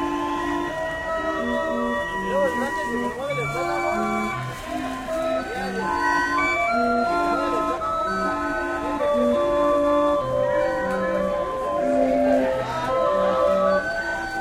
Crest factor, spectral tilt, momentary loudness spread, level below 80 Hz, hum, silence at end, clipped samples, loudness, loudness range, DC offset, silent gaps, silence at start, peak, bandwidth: 14 dB; -5.5 dB/octave; 6 LU; -46 dBFS; none; 0 s; under 0.1%; -23 LUFS; 3 LU; under 0.1%; none; 0 s; -8 dBFS; 15.5 kHz